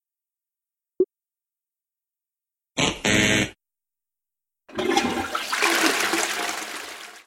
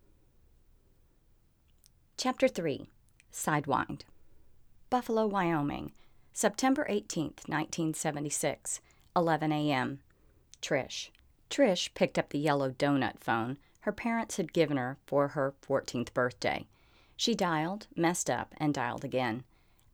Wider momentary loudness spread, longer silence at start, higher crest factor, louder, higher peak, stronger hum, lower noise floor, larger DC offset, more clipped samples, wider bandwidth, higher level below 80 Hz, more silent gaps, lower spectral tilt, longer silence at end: first, 14 LU vs 10 LU; second, 1 s vs 2.2 s; about the same, 22 dB vs 20 dB; first, -23 LUFS vs -32 LUFS; first, -4 dBFS vs -12 dBFS; neither; first, under -90 dBFS vs -66 dBFS; neither; neither; second, 16.5 kHz vs over 20 kHz; first, -52 dBFS vs -64 dBFS; neither; second, -2.5 dB/octave vs -4.5 dB/octave; second, 0.05 s vs 0.5 s